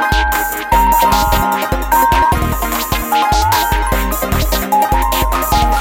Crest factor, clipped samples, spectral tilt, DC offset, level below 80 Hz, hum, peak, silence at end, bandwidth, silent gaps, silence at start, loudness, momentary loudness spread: 14 dB; under 0.1%; -4 dB/octave; under 0.1%; -20 dBFS; none; 0 dBFS; 0 s; 17.5 kHz; none; 0 s; -14 LUFS; 5 LU